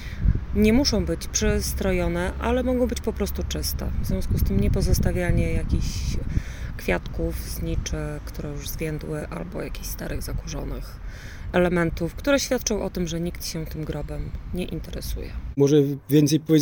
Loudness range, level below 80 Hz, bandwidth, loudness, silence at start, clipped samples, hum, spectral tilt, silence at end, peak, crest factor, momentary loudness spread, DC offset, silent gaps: 7 LU; -30 dBFS; 19.5 kHz; -25 LUFS; 0 s; under 0.1%; none; -5.5 dB/octave; 0 s; -6 dBFS; 18 dB; 13 LU; under 0.1%; none